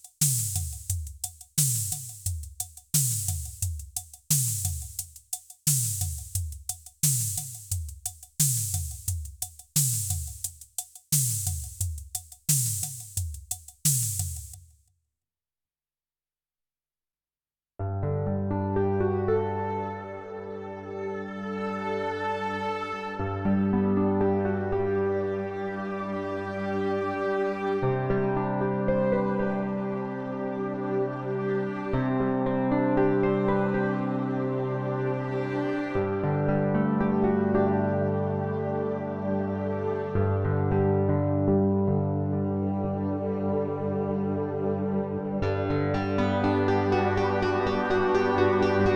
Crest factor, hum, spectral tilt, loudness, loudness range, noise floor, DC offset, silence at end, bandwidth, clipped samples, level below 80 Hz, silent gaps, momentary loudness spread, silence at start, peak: 18 dB; none; -5 dB/octave; -27 LUFS; 5 LU; under -90 dBFS; under 0.1%; 0 s; over 20 kHz; under 0.1%; -48 dBFS; none; 11 LU; 0.05 s; -8 dBFS